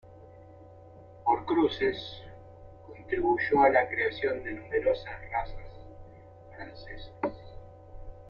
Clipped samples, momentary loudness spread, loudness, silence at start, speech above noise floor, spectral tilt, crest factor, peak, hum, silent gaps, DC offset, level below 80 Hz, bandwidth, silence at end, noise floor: under 0.1%; 26 LU; -28 LUFS; 0.05 s; 22 dB; -7.5 dB/octave; 22 dB; -10 dBFS; none; none; under 0.1%; -50 dBFS; 6.8 kHz; 0 s; -51 dBFS